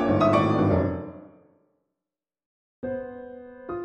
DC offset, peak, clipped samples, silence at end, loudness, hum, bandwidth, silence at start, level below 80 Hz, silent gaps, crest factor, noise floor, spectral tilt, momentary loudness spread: under 0.1%; -8 dBFS; under 0.1%; 0 s; -24 LUFS; none; 8.8 kHz; 0 s; -52 dBFS; 2.46-2.83 s; 18 dB; -89 dBFS; -8.5 dB/octave; 21 LU